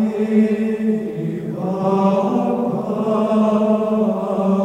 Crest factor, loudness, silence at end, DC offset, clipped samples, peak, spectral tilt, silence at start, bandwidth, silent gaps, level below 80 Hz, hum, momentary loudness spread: 14 dB; -18 LUFS; 0 s; under 0.1%; under 0.1%; -4 dBFS; -9 dB/octave; 0 s; 8.8 kHz; none; -58 dBFS; none; 7 LU